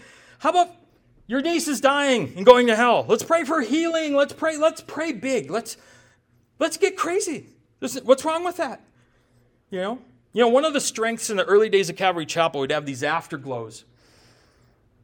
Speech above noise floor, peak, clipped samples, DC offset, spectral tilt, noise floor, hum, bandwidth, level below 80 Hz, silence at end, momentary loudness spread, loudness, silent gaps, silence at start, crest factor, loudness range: 40 dB; 0 dBFS; under 0.1%; under 0.1%; -3.5 dB/octave; -61 dBFS; none; 18.5 kHz; -64 dBFS; 1.25 s; 13 LU; -22 LUFS; none; 0.4 s; 22 dB; 7 LU